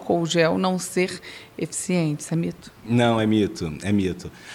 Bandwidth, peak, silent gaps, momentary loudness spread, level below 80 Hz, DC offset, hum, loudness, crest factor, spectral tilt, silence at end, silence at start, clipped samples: 16 kHz; -4 dBFS; none; 13 LU; -54 dBFS; under 0.1%; none; -23 LUFS; 18 dB; -5.5 dB/octave; 0 s; 0 s; under 0.1%